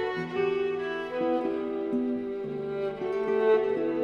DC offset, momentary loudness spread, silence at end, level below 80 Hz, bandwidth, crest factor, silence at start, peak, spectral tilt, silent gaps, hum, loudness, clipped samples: under 0.1%; 8 LU; 0 s; -64 dBFS; 6.6 kHz; 14 dB; 0 s; -14 dBFS; -7.5 dB/octave; none; none; -29 LUFS; under 0.1%